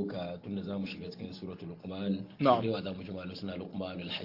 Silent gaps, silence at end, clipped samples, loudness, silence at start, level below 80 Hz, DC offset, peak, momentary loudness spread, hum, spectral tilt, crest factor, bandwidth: none; 0 s; under 0.1%; -35 LUFS; 0 s; -70 dBFS; under 0.1%; -10 dBFS; 15 LU; none; -8 dB/octave; 24 dB; 5.8 kHz